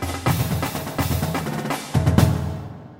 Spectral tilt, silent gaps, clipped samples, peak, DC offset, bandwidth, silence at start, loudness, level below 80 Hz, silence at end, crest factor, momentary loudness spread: -6 dB/octave; none; under 0.1%; -2 dBFS; under 0.1%; 16.5 kHz; 0 s; -22 LUFS; -36 dBFS; 0 s; 20 dB; 8 LU